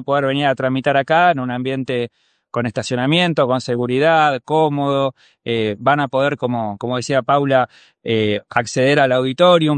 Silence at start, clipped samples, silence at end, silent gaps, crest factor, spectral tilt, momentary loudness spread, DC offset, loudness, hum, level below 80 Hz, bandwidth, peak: 0 s; under 0.1%; 0 s; none; 16 dB; -5.5 dB/octave; 9 LU; under 0.1%; -17 LUFS; none; -60 dBFS; 9.4 kHz; 0 dBFS